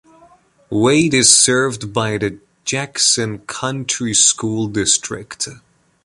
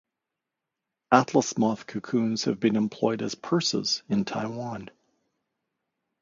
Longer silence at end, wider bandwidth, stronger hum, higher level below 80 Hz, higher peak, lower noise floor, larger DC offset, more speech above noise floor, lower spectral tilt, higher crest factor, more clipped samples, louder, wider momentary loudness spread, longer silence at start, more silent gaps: second, 0.45 s vs 1.3 s; first, 14 kHz vs 7.6 kHz; neither; first, -50 dBFS vs -68 dBFS; first, 0 dBFS vs -4 dBFS; second, -50 dBFS vs -86 dBFS; neither; second, 33 dB vs 60 dB; second, -2.5 dB/octave vs -4.5 dB/octave; second, 18 dB vs 24 dB; neither; first, -15 LUFS vs -26 LUFS; first, 15 LU vs 11 LU; second, 0.7 s vs 1.1 s; neither